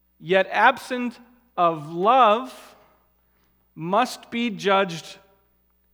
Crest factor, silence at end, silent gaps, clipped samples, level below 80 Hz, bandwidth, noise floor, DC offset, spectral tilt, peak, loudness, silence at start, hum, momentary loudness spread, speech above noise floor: 22 dB; 0.8 s; none; under 0.1%; -70 dBFS; 19.5 kHz; -65 dBFS; under 0.1%; -4.5 dB/octave; -2 dBFS; -21 LUFS; 0.2 s; none; 18 LU; 43 dB